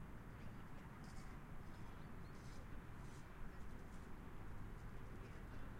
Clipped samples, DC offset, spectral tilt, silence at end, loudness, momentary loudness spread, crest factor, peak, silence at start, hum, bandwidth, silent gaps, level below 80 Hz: under 0.1%; under 0.1%; -6.5 dB/octave; 0 s; -57 LUFS; 1 LU; 12 dB; -38 dBFS; 0 s; none; 16 kHz; none; -56 dBFS